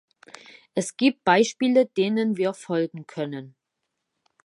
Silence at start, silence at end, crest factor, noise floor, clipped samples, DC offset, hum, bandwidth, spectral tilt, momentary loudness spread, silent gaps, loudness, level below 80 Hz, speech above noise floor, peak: 0.75 s; 0.95 s; 22 dB; -81 dBFS; under 0.1%; under 0.1%; none; 11.5 kHz; -5 dB/octave; 12 LU; none; -24 LUFS; -76 dBFS; 58 dB; -4 dBFS